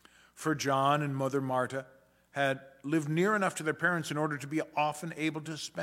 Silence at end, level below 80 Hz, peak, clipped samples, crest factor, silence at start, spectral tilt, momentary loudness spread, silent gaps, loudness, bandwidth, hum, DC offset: 0 s; -76 dBFS; -14 dBFS; under 0.1%; 18 dB; 0.35 s; -5 dB/octave; 9 LU; none; -32 LUFS; 16.5 kHz; none; under 0.1%